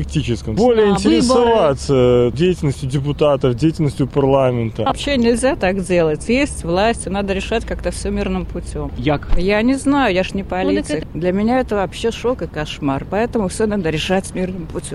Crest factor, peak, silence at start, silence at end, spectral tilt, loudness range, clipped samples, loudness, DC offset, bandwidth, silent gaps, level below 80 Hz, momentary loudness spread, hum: 16 dB; 0 dBFS; 0 s; 0 s; -6 dB/octave; 5 LU; under 0.1%; -17 LUFS; under 0.1%; 13 kHz; none; -30 dBFS; 9 LU; none